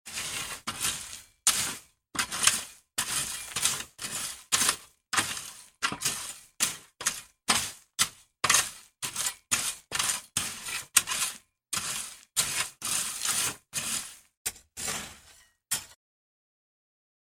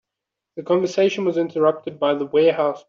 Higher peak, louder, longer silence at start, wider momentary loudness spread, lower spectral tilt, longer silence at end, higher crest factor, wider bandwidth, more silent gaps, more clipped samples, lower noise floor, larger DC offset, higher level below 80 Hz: first, -2 dBFS vs -6 dBFS; second, -29 LUFS vs -20 LUFS; second, 0.05 s vs 0.55 s; first, 12 LU vs 6 LU; second, 0.5 dB/octave vs -6 dB/octave; first, 1.35 s vs 0.1 s; first, 30 dB vs 14 dB; first, 17 kHz vs 7.4 kHz; first, 14.37-14.45 s vs none; neither; second, -59 dBFS vs -84 dBFS; neither; first, -62 dBFS vs -70 dBFS